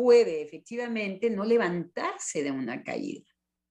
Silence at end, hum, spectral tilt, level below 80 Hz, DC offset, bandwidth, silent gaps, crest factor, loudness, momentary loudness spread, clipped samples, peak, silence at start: 0.55 s; none; -4.5 dB/octave; -76 dBFS; under 0.1%; 10.5 kHz; none; 18 dB; -29 LUFS; 12 LU; under 0.1%; -10 dBFS; 0 s